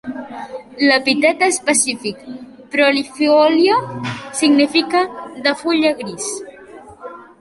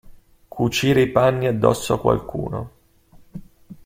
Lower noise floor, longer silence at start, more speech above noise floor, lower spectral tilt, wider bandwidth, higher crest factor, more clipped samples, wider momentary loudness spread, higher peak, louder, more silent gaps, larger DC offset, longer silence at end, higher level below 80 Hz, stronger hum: second, -39 dBFS vs -51 dBFS; about the same, 0.05 s vs 0.05 s; second, 23 dB vs 32 dB; second, -2.5 dB/octave vs -6 dB/octave; second, 11.5 kHz vs 16.5 kHz; about the same, 16 dB vs 20 dB; neither; second, 20 LU vs 24 LU; about the same, -2 dBFS vs -2 dBFS; first, -16 LUFS vs -20 LUFS; neither; neither; about the same, 0.15 s vs 0.1 s; second, -60 dBFS vs -46 dBFS; neither